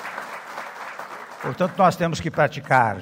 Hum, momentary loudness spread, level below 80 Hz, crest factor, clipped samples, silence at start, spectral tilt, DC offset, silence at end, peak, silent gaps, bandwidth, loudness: none; 15 LU; -56 dBFS; 20 dB; under 0.1%; 0 s; -6 dB/octave; under 0.1%; 0 s; -2 dBFS; none; 16 kHz; -22 LUFS